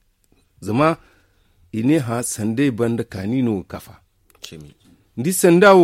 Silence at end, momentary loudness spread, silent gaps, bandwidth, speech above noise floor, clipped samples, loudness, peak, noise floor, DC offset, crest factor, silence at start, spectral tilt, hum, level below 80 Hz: 0 s; 21 LU; none; 16.5 kHz; 43 dB; under 0.1%; -19 LUFS; -2 dBFS; -60 dBFS; under 0.1%; 18 dB; 0.6 s; -5.5 dB/octave; none; -54 dBFS